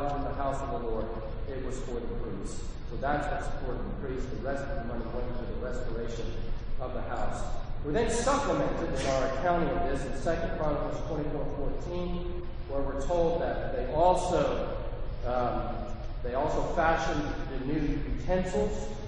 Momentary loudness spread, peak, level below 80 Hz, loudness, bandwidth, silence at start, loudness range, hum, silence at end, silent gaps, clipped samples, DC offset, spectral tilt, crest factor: 11 LU; -10 dBFS; -36 dBFS; -32 LUFS; 9.4 kHz; 0 s; 6 LU; none; 0 s; none; under 0.1%; under 0.1%; -6 dB/octave; 18 dB